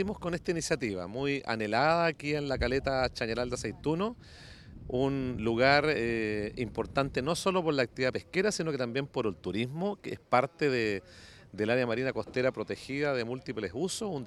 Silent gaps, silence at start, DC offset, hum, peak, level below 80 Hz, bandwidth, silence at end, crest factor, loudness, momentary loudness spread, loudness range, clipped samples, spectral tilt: none; 0 s; under 0.1%; none; -8 dBFS; -52 dBFS; 14 kHz; 0 s; 22 dB; -31 LUFS; 9 LU; 3 LU; under 0.1%; -5 dB/octave